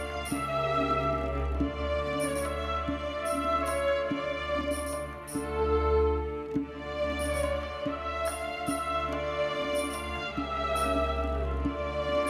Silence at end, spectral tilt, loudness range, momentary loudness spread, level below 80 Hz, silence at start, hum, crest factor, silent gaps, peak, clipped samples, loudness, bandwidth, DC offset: 0 s; -5 dB/octave; 2 LU; 6 LU; -38 dBFS; 0 s; none; 14 dB; none; -16 dBFS; under 0.1%; -31 LUFS; 15.5 kHz; under 0.1%